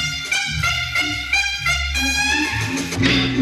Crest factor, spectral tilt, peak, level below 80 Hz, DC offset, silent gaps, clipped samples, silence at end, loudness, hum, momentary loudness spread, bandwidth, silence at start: 16 dB; -3 dB/octave; -4 dBFS; -34 dBFS; under 0.1%; none; under 0.1%; 0 s; -18 LUFS; none; 3 LU; 14.5 kHz; 0 s